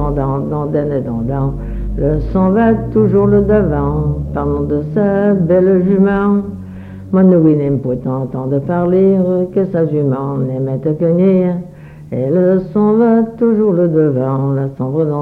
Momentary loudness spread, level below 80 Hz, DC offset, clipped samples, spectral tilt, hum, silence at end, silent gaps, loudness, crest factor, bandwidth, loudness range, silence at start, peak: 8 LU; -30 dBFS; under 0.1%; under 0.1%; -11.5 dB/octave; none; 0 s; none; -14 LUFS; 12 dB; 3.8 kHz; 2 LU; 0 s; 0 dBFS